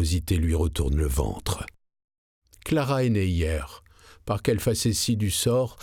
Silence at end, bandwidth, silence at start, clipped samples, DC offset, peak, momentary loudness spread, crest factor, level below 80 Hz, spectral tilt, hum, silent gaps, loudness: 0 s; 18.5 kHz; 0 s; under 0.1%; under 0.1%; -10 dBFS; 10 LU; 16 dB; -36 dBFS; -5 dB/octave; none; 2.04-2.08 s, 2.18-2.42 s; -25 LUFS